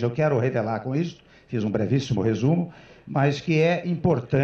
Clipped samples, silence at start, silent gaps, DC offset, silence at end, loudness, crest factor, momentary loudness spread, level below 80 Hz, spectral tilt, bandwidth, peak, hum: under 0.1%; 0 s; none; under 0.1%; 0 s; -24 LUFS; 14 dB; 7 LU; -54 dBFS; -7.5 dB/octave; 7 kHz; -10 dBFS; none